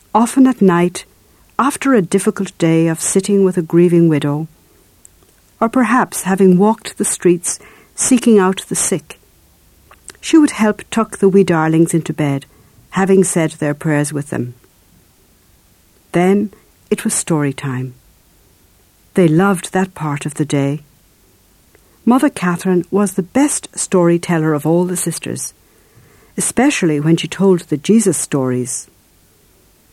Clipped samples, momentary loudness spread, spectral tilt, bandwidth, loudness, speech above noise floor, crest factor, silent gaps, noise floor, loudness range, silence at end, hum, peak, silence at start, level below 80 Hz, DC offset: under 0.1%; 11 LU; -5.5 dB/octave; 15.5 kHz; -15 LUFS; 37 dB; 14 dB; none; -51 dBFS; 5 LU; 1.1 s; none; 0 dBFS; 0.15 s; -54 dBFS; under 0.1%